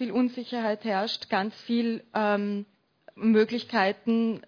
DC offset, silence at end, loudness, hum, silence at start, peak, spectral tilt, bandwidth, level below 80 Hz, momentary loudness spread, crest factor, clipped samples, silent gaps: under 0.1%; 0.05 s; -27 LUFS; none; 0 s; -10 dBFS; -6.5 dB/octave; 5.4 kHz; -76 dBFS; 6 LU; 18 dB; under 0.1%; none